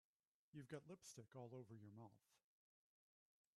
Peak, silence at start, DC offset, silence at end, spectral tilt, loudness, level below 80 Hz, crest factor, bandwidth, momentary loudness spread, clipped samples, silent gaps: -42 dBFS; 0.55 s; under 0.1%; 1.2 s; -5.5 dB/octave; -61 LUFS; under -90 dBFS; 22 dB; 13 kHz; 7 LU; under 0.1%; none